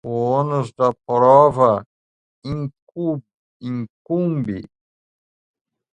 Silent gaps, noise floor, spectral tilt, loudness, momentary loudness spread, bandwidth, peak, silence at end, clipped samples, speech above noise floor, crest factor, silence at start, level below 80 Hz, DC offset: 1.86-2.42 s, 2.82-2.87 s, 3.34-3.60 s, 3.90-4.05 s; under -90 dBFS; -9 dB/octave; -19 LUFS; 18 LU; 9.4 kHz; 0 dBFS; 1.25 s; under 0.1%; over 72 dB; 20 dB; 0.05 s; -54 dBFS; under 0.1%